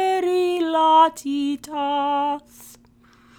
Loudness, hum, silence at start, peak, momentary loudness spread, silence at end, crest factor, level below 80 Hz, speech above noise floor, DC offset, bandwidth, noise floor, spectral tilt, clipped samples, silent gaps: -20 LUFS; none; 0 s; -4 dBFS; 11 LU; 0.7 s; 16 dB; -64 dBFS; 29 dB; under 0.1%; 18 kHz; -54 dBFS; -3 dB/octave; under 0.1%; none